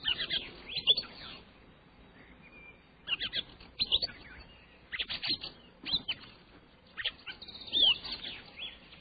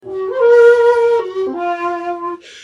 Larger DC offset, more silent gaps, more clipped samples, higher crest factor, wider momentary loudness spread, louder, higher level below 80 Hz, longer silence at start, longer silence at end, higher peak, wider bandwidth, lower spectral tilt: neither; neither; neither; first, 22 dB vs 12 dB; first, 24 LU vs 14 LU; second, -32 LUFS vs -13 LUFS; about the same, -60 dBFS vs -62 dBFS; about the same, 0 s vs 0.05 s; about the same, 0 s vs 0 s; second, -14 dBFS vs -2 dBFS; second, 5 kHz vs 7.6 kHz; about the same, -5 dB/octave vs -4.5 dB/octave